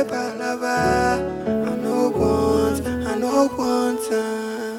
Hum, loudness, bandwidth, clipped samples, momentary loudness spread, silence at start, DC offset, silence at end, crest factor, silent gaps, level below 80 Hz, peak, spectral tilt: none; -21 LUFS; 17.5 kHz; under 0.1%; 6 LU; 0 s; under 0.1%; 0 s; 14 dB; none; -42 dBFS; -6 dBFS; -5.5 dB/octave